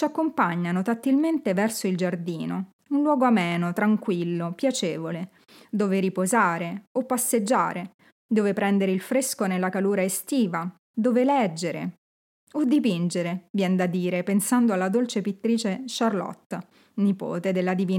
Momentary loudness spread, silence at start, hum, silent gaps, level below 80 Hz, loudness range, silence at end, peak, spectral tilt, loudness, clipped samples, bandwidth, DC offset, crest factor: 10 LU; 0 s; none; 2.73-2.79 s, 6.87-6.95 s, 7.94-7.99 s, 8.12-8.29 s, 10.79-10.94 s, 11.98-12.47 s, 13.50-13.54 s, 16.46-16.50 s; -84 dBFS; 2 LU; 0 s; -8 dBFS; -5.5 dB/octave; -25 LUFS; under 0.1%; 17 kHz; under 0.1%; 16 dB